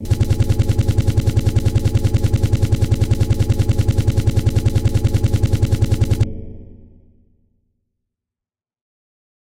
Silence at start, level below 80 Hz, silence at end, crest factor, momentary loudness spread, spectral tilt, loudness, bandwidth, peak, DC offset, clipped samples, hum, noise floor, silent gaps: 0 s; -24 dBFS; 2.6 s; 12 dB; 1 LU; -7 dB/octave; -18 LUFS; 16 kHz; -4 dBFS; under 0.1%; under 0.1%; none; -90 dBFS; none